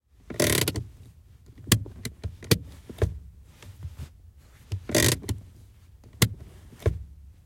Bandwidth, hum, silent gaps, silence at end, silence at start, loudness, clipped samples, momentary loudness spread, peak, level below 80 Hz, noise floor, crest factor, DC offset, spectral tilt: 17 kHz; none; none; 0.15 s; 0.3 s; -27 LUFS; under 0.1%; 22 LU; -4 dBFS; -44 dBFS; -52 dBFS; 26 dB; under 0.1%; -4 dB/octave